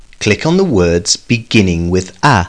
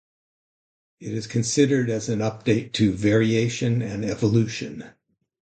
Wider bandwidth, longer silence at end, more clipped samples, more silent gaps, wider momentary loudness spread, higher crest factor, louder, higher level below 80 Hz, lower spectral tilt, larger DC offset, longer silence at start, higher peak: first, 10.5 kHz vs 9.2 kHz; second, 0 s vs 0.7 s; neither; neither; second, 4 LU vs 12 LU; second, 12 dB vs 18 dB; first, -13 LUFS vs -23 LUFS; first, -34 dBFS vs -54 dBFS; about the same, -4.5 dB/octave vs -5.5 dB/octave; first, 0.6% vs under 0.1%; second, 0.2 s vs 1 s; first, 0 dBFS vs -6 dBFS